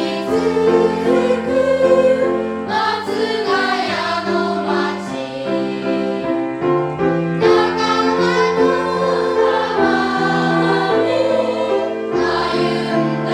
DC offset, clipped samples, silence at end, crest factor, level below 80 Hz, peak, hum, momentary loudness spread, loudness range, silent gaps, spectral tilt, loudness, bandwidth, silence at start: under 0.1%; under 0.1%; 0 s; 16 dB; -54 dBFS; 0 dBFS; none; 6 LU; 4 LU; none; -6 dB/octave; -17 LUFS; 11.5 kHz; 0 s